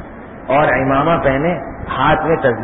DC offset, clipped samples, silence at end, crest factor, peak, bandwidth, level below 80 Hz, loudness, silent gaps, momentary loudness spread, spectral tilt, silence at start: under 0.1%; under 0.1%; 0 s; 14 dB; -2 dBFS; 4 kHz; -36 dBFS; -15 LUFS; none; 10 LU; -12 dB/octave; 0 s